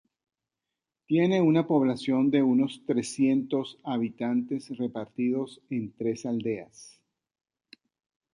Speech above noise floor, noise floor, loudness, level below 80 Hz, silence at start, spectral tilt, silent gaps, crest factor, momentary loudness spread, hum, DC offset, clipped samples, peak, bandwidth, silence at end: 61 dB; -88 dBFS; -27 LUFS; -72 dBFS; 1.1 s; -6.5 dB/octave; none; 16 dB; 11 LU; none; under 0.1%; under 0.1%; -12 dBFS; 11 kHz; 1.45 s